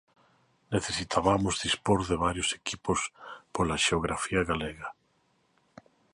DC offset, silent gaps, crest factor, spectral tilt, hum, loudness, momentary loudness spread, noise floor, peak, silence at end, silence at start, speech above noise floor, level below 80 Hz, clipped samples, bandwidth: under 0.1%; none; 22 dB; -4 dB/octave; none; -29 LUFS; 11 LU; -70 dBFS; -8 dBFS; 1.2 s; 0.7 s; 41 dB; -48 dBFS; under 0.1%; 11.5 kHz